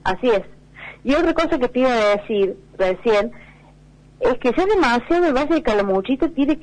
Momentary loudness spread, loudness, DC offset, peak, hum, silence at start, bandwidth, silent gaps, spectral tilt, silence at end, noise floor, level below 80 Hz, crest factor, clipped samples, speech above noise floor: 6 LU; -19 LUFS; 0.2%; -8 dBFS; none; 0.05 s; 10 kHz; none; -5.5 dB/octave; 0 s; -47 dBFS; -40 dBFS; 12 dB; under 0.1%; 29 dB